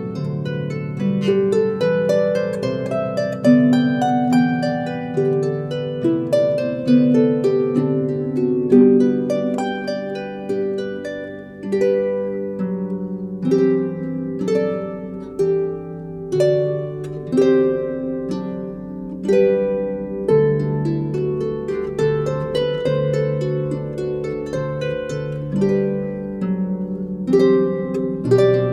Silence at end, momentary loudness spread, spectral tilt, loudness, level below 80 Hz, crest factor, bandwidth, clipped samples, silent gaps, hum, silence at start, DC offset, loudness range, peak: 0 s; 10 LU; -8 dB/octave; -20 LUFS; -50 dBFS; 16 dB; 11 kHz; under 0.1%; none; none; 0 s; under 0.1%; 5 LU; -2 dBFS